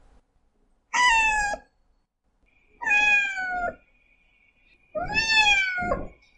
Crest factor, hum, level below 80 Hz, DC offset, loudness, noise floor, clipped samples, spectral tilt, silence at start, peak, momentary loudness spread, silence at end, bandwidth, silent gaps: 18 dB; none; -46 dBFS; under 0.1%; -21 LUFS; -70 dBFS; under 0.1%; -1 dB/octave; 0.95 s; -8 dBFS; 15 LU; 0.3 s; 11 kHz; none